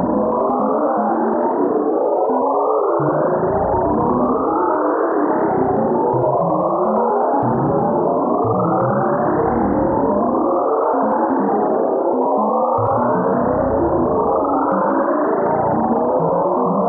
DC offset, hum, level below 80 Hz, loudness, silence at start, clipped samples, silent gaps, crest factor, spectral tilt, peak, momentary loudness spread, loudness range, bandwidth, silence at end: under 0.1%; none; -44 dBFS; -17 LUFS; 0 s; under 0.1%; none; 12 dB; -13.5 dB/octave; -6 dBFS; 1 LU; 0 LU; 2.6 kHz; 0 s